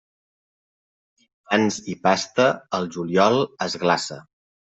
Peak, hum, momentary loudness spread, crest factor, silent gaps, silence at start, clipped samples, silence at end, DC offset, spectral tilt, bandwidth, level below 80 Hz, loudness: -2 dBFS; none; 8 LU; 20 dB; none; 1.5 s; under 0.1%; 0.55 s; under 0.1%; -4.5 dB/octave; 8.2 kHz; -66 dBFS; -22 LUFS